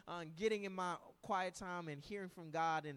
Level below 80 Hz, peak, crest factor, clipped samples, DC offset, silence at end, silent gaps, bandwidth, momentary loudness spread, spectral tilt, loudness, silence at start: -74 dBFS; -26 dBFS; 16 dB; under 0.1%; under 0.1%; 0 s; none; 15 kHz; 9 LU; -5 dB/octave; -43 LUFS; 0.05 s